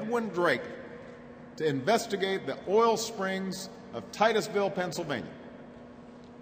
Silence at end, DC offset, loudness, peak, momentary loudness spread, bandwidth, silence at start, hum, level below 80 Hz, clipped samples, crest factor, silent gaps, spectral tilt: 0 s; under 0.1%; -30 LUFS; -12 dBFS; 22 LU; 16 kHz; 0 s; none; -68 dBFS; under 0.1%; 20 dB; none; -4.5 dB/octave